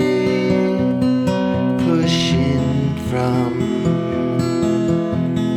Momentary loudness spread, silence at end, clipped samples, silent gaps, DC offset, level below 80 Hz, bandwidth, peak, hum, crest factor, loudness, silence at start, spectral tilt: 3 LU; 0 s; under 0.1%; none; under 0.1%; -42 dBFS; 12.5 kHz; -4 dBFS; none; 12 dB; -18 LUFS; 0 s; -7 dB/octave